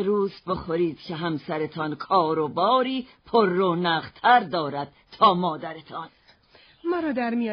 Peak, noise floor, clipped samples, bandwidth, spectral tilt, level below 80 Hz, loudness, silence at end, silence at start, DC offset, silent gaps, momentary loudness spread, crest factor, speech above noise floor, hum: -6 dBFS; -56 dBFS; under 0.1%; 5.4 kHz; -3.5 dB/octave; -60 dBFS; -24 LUFS; 0 s; 0 s; under 0.1%; none; 15 LU; 18 dB; 32 dB; none